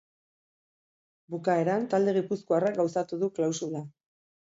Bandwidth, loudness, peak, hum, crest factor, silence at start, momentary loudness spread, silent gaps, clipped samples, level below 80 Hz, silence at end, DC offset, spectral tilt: 7.8 kHz; -28 LUFS; -14 dBFS; none; 16 dB; 1.3 s; 11 LU; none; under 0.1%; -76 dBFS; 0.65 s; under 0.1%; -6 dB/octave